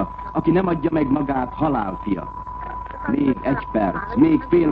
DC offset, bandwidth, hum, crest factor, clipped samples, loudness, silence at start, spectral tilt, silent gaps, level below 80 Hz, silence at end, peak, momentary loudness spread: under 0.1%; 4.9 kHz; none; 14 dB; under 0.1%; -21 LUFS; 0 s; -10.5 dB/octave; none; -38 dBFS; 0 s; -6 dBFS; 13 LU